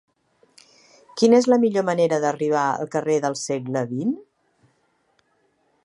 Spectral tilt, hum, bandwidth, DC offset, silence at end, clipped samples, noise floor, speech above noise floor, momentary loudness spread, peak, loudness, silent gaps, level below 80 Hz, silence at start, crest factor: -5.5 dB/octave; none; 11.5 kHz; under 0.1%; 1.65 s; under 0.1%; -66 dBFS; 46 dB; 10 LU; -4 dBFS; -21 LUFS; none; -74 dBFS; 1.15 s; 18 dB